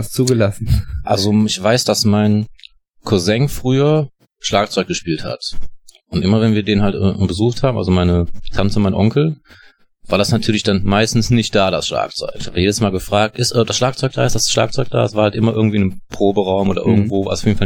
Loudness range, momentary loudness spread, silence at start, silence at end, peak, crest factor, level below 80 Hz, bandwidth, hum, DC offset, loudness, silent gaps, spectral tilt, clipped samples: 2 LU; 7 LU; 0 s; 0 s; -2 dBFS; 14 dB; -34 dBFS; 18.5 kHz; none; under 0.1%; -16 LUFS; none; -5.5 dB/octave; under 0.1%